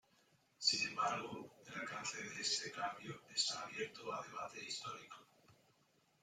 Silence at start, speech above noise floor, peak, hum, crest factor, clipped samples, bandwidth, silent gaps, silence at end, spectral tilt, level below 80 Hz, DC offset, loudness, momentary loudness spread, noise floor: 0.6 s; 31 dB; -20 dBFS; none; 24 dB; under 0.1%; 16 kHz; none; 0.7 s; -1 dB/octave; -84 dBFS; under 0.1%; -41 LUFS; 15 LU; -76 dBFS